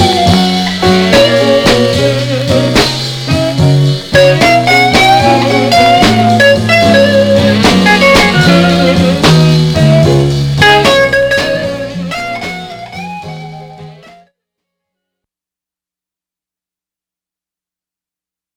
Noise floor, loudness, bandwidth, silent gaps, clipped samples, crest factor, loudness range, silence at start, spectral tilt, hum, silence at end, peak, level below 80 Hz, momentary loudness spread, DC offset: -88 dBFS; -8 LUFS; 20 kHz; none; 0.8%; 10 dB; 13 LU; 0 s; -5 dB/octave; none; 4.65 s; 0 dBFS; -32 dBFS; 12 LU; under 0.1%